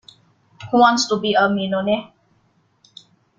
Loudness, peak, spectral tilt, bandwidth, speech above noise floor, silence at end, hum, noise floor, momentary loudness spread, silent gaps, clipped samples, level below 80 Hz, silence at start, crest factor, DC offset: -18 LUFS; 0 dBFS; -4 dB/octave; 9.2 kHz; 44 dB; 1.3 s; none; -61 dBFS; 7 LU; none; under 0.1%; -60 dBFS; 0.6 s; 20 dB; under 0.1%